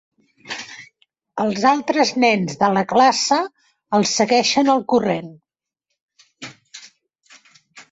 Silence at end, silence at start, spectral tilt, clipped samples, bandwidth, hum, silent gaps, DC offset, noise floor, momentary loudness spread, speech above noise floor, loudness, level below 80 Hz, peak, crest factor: 0.1 s; 0.45 s; -3.5 dB/octave; under 0.1%; 8.2 kHz; none; 6.02-6.08 s; under 0.1%; -79 dBFS; 22 LU; 62 dB; -17 LUFS; -64 dBFS; -2 dBFS; 18 dB